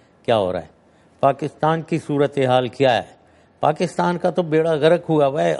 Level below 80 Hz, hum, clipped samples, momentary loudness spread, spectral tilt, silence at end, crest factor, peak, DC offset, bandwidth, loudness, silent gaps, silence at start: -60 dBFS; none; under 0.1%; 6 LU; -6.5 dB/octave; 0 s; 18 dB; -2 dBFS; under 0.1%; 11.5 kHz; -19 LUFS; none; 0.3 s